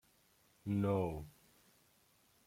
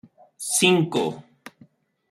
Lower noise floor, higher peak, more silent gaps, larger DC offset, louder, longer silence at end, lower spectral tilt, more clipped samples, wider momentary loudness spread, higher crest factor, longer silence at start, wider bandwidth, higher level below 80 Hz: first, -72 dBFS vs -56 dBFS; second, -24 dBFS vs -2 dBFS; neither; neither; second, -39 LUFS vs -21 LUFS; first, 1.15 s vs 0.9 s; first, -8.5 dB/octave vs -3.5 dB/octave; neither; about the same, 15 LU vs 16 LU; about the same, 18 dB vs 22 dB; first, 0.65 s vs 0.4 s; about the same, 16 kHz vs 15 kHz; first, -64 dBFS vs -70 dBFS